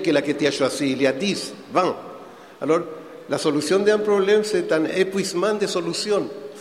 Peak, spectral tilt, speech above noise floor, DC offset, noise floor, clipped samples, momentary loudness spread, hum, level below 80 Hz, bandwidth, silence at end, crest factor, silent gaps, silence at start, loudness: -4 dBFS; -4.5 dB/octave; 20 dB; under 0.1%; -41 dBFS; under 0.1%; 12 LU; none; -66 dBFS; 14.5 kHz; 0 s; 18 dB; none; 0 s; -21 LUFS